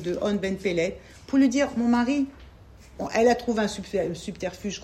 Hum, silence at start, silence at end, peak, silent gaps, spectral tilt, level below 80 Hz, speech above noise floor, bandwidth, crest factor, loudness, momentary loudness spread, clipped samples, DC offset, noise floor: none; 0 s; 0 s; -8 dBFS; none; -5 dB/octave; -50 dBFS; 24 dB; 13 kHz; 16 dB; -25 LUFS; 11 LU; under 0.1%; under 0.1%; -48 dBFS